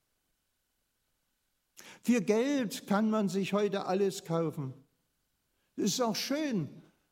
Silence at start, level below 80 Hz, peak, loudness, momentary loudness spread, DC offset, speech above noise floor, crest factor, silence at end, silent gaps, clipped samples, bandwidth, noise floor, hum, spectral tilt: 1.8 s; -82 dBFS; -14 dBFS; -31 LUFS; 9 LU; under 0.1%; 49 dB; 18 dB; 0.3 s; none; under 0.1%; 16 kHz; -80 dBFS; none; -5 dB/octave